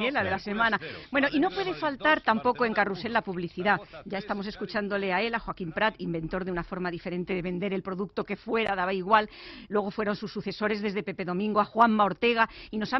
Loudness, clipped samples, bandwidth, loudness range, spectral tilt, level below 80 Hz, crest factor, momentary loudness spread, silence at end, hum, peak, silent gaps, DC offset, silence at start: -28 LUFS; under 0.1%; 6 kHz; 4 LU; -7 dB/octave; -56 dBFS; 20 dB; 9 LU; 0 s; none; -8 dBFS; none; under 0.1%; 0 s